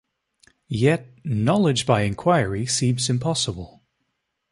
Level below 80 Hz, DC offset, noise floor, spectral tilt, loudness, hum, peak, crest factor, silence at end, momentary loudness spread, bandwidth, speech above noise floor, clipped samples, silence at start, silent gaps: -50 dBFS; under 0.1%; -76 dBFS; -5 dB/octave; -22 LUFS; none; -4 dBFS; 20 dB; 0.85 s; 9 LU; 11.5 kHz; 55 dB; under 0.1%; 0.7 s; none